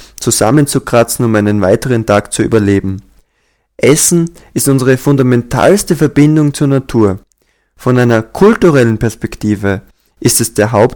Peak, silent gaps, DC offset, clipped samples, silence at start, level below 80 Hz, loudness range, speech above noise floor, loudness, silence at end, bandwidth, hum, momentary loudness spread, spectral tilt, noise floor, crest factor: 0 dBFS; none; under 0.1%; 0.6%; 0 s; -36 dBFS; 2 LU; 50 dB; -11 LUFS; 0 s; 19 kHz; none; 8 LU; -5.5 dB/octave; -60 dBFS; 10 dB